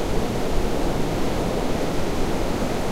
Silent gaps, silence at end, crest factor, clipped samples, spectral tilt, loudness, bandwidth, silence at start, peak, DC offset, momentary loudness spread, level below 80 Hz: none; 0 s; 14 dB; under 0.1%; -5.5 dB/octave; -25 LUFS; 16 kHz; 0 s; -8 dBFS; under 0.1%; 1 LU; -28 dBFS